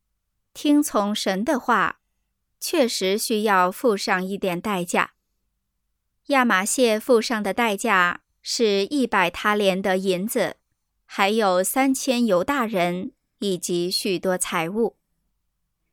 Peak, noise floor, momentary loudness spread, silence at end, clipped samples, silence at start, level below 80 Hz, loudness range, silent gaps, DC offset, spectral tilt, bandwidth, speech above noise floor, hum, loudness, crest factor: -4 dBFS; -76 dBFS; 7 LU; 1.05 s; under 0.1%; 0.55 s; -62 dBFS; 3 LU; none; under 0.1%; -3.5 dB/octave; 19 kHz; 55 dB; none; -22 LUFS; 18 dB